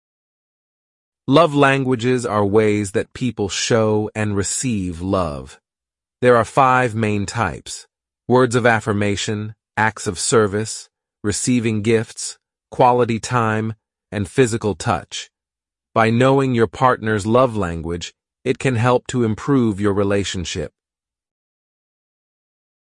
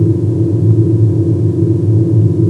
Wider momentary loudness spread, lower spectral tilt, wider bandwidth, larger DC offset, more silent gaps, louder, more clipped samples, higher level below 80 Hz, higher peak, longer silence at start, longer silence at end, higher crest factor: first, 13 LU vs 2 LU; second, -5 dB/octave vs -11.5 dB/octave; first, 11.5 kHz vs 1.7 kHz; neither; neither; second, -18 LUFS vs -12 LUFS; neither; about the same, -50 dBFS vs -50 dBFS; about the same, -2 dBFS vs 0 dBFS; first, 1.3 s vs 0 s; first, 2.25 s vs 0 s; first, 18 dB vs 10 dB